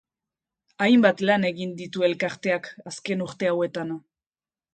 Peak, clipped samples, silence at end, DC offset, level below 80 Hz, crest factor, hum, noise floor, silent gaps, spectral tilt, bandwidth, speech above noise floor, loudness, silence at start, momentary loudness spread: -6 dBFS; under 0.1%; 0.75 s; under 0.1%; -70 dBFS; 20 dB; none; under -90 dBFS; none; -5.5 dB/octave; 9.2 kHz; over 66 dB; -24 LUFS; 0.8 s; 15 LU